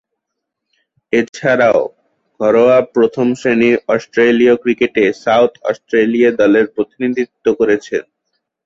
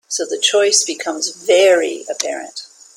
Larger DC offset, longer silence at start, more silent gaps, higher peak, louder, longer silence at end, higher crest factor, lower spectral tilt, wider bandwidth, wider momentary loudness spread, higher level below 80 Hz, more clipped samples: neither; first, 1.15 s vs 0.1 s; neither; about the same, -2 dBFS vs 0 dBFS; about the same, -14 LUFS vs -15 LUFS; first, 0.65 s vs 0.3 s; about the same, 12 dB vs 16 dB; first, -6 dB/octave vs 0.5 dB/octave; second, 7.8 kHz vs 16.5 kHz; second, 8 LU vs 13 LU; first, -56 dBFS vs -68 dBFS; neither